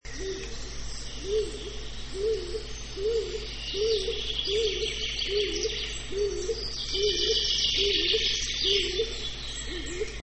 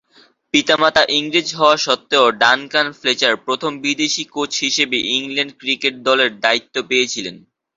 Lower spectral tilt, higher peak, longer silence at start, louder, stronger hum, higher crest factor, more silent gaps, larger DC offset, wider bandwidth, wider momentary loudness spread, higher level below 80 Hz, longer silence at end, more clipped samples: about the same, -2.5 dB/octave vs -1.5 dB/octave; second, -12 dBFS vs 0 dBFS; second, 0 s vs 0.55 s; second, -28 LUFS vs -16 LUFS; neither; about the same, 18 dB vs 18 dB; neither; first, 0.3% vs under 0.1%; first, 8.8 kHz vs 7.8 kHz; first, 14 LU vs 7 LU; first, -40 dBFS vs -60 dBFS; second, 0 s vs 0.4 s; neither